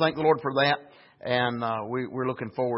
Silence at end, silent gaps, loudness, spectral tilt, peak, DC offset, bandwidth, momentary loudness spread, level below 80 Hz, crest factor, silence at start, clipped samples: 0 s; none; -27 LUFS; -10 dB/octave; -8 dBFS; under 0.1%; 5.8 kHz; 7 LU; -66 dBFS; 18 dB; 0 s; under 0.1%